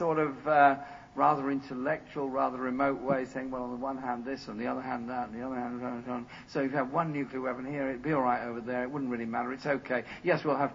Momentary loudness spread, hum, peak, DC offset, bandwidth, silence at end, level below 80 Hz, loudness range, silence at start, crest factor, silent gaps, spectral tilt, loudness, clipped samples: 9 LU; none; -10 dBFS; under 0.1%; 7.6 kHz; 0 s; -64 dBFS; 6 LU; 0 s; 20 dB; none; -7.5 dB/octave; -32 LUFS; under 0.1%